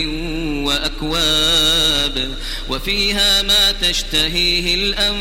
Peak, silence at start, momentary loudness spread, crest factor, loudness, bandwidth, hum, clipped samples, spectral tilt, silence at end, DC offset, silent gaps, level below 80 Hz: -2 dBFS; 0 s; 11 LU; 14 dB; -15 LUFS; 16.5 kHz; none; under 0.1%; -2 dB/octave; 0 s; 0.1%; none; -28 dBFS